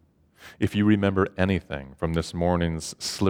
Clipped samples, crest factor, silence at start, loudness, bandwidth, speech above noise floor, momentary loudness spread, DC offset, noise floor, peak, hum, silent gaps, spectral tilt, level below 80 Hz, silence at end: under 0.1%; 20 dB; 0.4 s; -25 LUFS; 16 kHz; 27 dB; 9 LU; under 0.1%; -52 dBFS; -6 dBFS; none; none; -6 dB/octave; -44 dBFS; 0 s